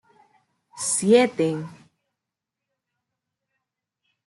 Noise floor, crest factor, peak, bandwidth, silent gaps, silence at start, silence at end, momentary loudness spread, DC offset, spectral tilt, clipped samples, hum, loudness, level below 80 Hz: -86 dBFS; 20 dB; -6 dBFS; 12 kHz; none; 0.75 s; 2.55 s; 15 LU; under 0.1%; -4 dB/octave; under 0.1%; none; -21 LUFS; -72 dBFS